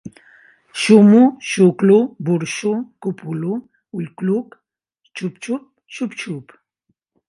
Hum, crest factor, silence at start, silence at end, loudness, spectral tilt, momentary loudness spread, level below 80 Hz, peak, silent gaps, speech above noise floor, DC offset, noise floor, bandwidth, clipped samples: none; 18 dB; 0.05 s; 0.85 s; -17 LUFS; -6.5 dB/octave; 19 LU; -68 dBFS; 0 dBFS; none; 54 dB; under 0.1%; -70 dBFS; 11.5 kHz; under 0.1%